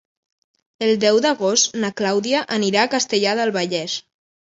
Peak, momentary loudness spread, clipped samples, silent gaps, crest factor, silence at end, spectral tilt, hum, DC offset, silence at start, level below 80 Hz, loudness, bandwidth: -2 dBFS; 7 LU; under 0.1%; none; 18 dB; 0.55 s; -2.5 dB/octave; none; under 0.1%; 0.8 s; -68 dBFS; -19 LUFS; 8 kHz